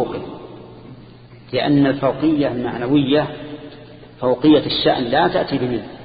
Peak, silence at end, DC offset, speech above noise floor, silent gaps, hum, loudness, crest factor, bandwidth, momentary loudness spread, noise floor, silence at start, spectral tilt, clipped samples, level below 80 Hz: -2 dBFS; 0 s; under 0.1%; 24 dB; none; none; -18 LUFS; 16 dB; 5 kHz; 21 LU; -41 dBFS; 0 s; -11.5 dB/octave; under 0.1%; -48 dBFS